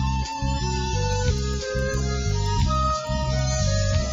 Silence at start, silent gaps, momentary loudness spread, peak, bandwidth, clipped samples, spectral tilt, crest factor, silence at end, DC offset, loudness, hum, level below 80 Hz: 0 s; none; 4 LU; -10 dBFS; 7.8 kHz; under 0.1%; -5 dB/octave; 14 dB; 0 s; under 0.1%; -24 LUFS; none; -28 dBFS